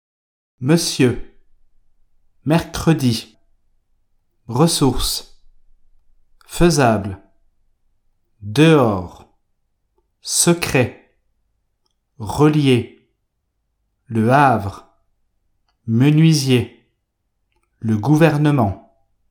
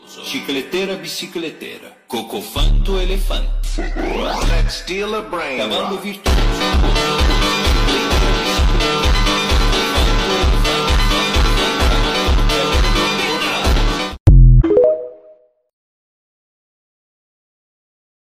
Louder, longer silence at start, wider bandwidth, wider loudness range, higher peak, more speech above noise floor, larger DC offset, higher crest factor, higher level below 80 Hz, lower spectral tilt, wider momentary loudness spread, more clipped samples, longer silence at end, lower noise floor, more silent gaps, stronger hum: about the same, -16 LUFS vs -17 LUFS; first, 0.6 s vs 0.1 s; first, 19 kHz vs 15.5 kHz; second, 4 LU vs 7 LU; about the same, 0 dBFS vs 0 dBFS; first, 56 dB vs 30 dB; neither; about the same, 20 dB vs 16 dB; second, -40 dBFS vs -18 dBFS; about the same, -5.5 dB/octave vs -4.5 dB/octave; first, 18 LU vs 10 LU; neither; second, 0.5 s vs 3.1 s; first, -71 dBFS vs -48 dBFS; second, none vs 14.20-14.26 s; neither